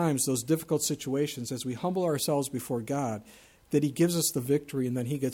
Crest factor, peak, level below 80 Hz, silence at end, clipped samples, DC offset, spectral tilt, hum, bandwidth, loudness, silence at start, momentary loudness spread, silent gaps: 16 dB; -12 dBFS; -66 dBFS; 0 s; under 0.1%; under 0.1%; -5 dB/octave; none; 19 kHz; -29 LUFS; 0 s; 7 LU; none